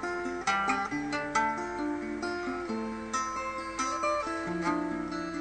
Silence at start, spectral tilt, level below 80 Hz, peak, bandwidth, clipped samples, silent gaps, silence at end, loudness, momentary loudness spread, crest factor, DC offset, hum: 0 s; -4 dB/octave; -56 dBFS; -14 dBFS; 9.4 kHz; under 0.1%; none; 0 s; -32 LUFS; 6 LU; 18 dB; under 0.1%; none